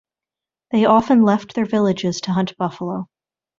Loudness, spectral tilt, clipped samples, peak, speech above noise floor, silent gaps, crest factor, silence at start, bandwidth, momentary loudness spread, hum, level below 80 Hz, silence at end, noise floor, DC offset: -18 LUFS; -6.5 dB/octave; under 0.1%; -2 dBFS; 71 dB; none; 18 dB; 0.7 s; 7.4 kHz; 13 LU; none; -58 dBFS; 0.55 s; -89 dBFS; under 0.1%